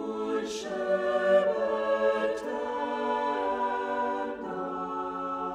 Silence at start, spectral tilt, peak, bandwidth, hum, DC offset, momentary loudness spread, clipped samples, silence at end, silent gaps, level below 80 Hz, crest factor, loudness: 0 s; -4.5 dB/octave; -12 dBFS; 10 kHz; none; under 0.1%; 9 LU; under 0.1%; 0 s; none; -64 dBFS; 16 dB; -29 LUFS